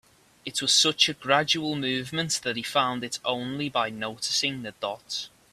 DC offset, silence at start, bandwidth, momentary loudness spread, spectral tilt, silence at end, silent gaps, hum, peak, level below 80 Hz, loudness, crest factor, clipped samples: under 0.1%; 0.45 s; 15.5 kHz; 13 LU; -2 dB/octave; 0.25 s; none; none; -4 dBFS; -68 dBFS; -25 LUFS; 24 dB; under 0.1%